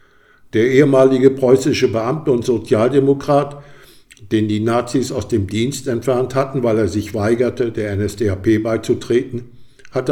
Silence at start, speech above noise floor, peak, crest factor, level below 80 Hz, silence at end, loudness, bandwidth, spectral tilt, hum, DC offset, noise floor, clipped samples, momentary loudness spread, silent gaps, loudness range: 0.55 s; 33 dB; 0 dBFS; 16 dB; -48 dBFS; 0 s; -17 LUFS; 16.5 kHz; -6.5 dB/octave; none; under 0.1%; -49 dBFS; under 0.1%; 9 LU; none; 5 LU